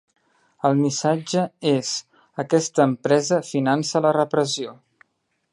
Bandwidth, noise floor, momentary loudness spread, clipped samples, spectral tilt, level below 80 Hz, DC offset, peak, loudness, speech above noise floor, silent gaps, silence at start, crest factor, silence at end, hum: 11.5 kHz; -73 dBFS; 9 LU; under 0.1%; -5 dB/octave; -72 dBFS; under 0.1%; -4 dBFS; -21 LUFS; 52 dB; none; 0.65 s; 18 dB; 0.8 s; none